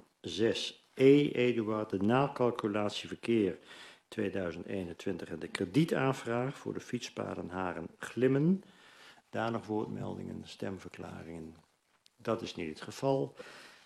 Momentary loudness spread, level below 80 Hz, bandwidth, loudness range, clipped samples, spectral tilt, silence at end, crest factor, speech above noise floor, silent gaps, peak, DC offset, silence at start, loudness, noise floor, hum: 15 LU; -72 dBFS; 13 kHz; 10 LU; under 0.1%; -6.5 dB/octave; 0.15 s; 22 dB; 37 dB; none; -12 dBFS; under 0.1%; 0.25 s; -33 LUFS; -70 dBFS; none